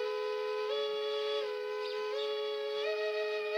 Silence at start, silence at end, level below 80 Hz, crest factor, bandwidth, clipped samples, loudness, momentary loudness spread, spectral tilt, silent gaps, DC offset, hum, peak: 0 s; 0 s; under -90 dBFS; 12 dB; 10.5 kHz; under 0.1%; -35 LUFS; 3 LU; -0.5 dB/octave; none; under 0.1%; none; -22 dBFS